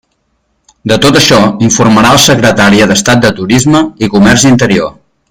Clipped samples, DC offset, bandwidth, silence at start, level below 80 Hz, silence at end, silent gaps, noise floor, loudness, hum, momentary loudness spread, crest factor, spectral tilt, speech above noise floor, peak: 2%; under 0.1%; over 20 kHz; 0.85 s; -34 dBFS; 0.4 s; none; -59 dBFS; -6 LUFS; none; 6 LU; 6 dB; -4 dB/octave; 53 dB; 0 dBFS